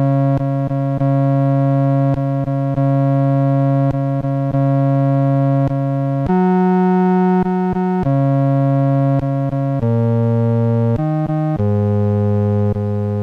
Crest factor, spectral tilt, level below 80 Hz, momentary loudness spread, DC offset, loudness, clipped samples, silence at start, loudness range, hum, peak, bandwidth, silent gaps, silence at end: 8 dB; -11 dB/octave; -44 dBFS; 5 LU; under 0.1%; -16 LUFS; under 0.1%; 0 s; 1 LU; none; -6 dBFS; 4.2 kHz; none; 0 s